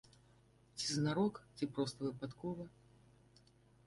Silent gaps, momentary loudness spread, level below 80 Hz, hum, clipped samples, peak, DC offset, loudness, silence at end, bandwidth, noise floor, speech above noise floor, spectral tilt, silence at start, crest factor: none; 12 LU; -72 dBFS; none; under 0.1%; -24 dBFS; under 0.1%; -40 LUFS; 1.2 s; 11.5 kHz; -68 dBFS; 28 dB; -5 dB/octave; 0.75 s; 18 dB